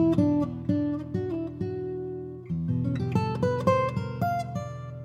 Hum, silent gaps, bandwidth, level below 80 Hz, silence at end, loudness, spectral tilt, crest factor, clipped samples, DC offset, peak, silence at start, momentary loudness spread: none; none; 12.5 kHz; -50 dBFS; 0 s; -28 LUFS; -8.5 dB/octave; 18 dB; under 0.1%; under 0.1%; -8 dBFS; 0 s; 10 LU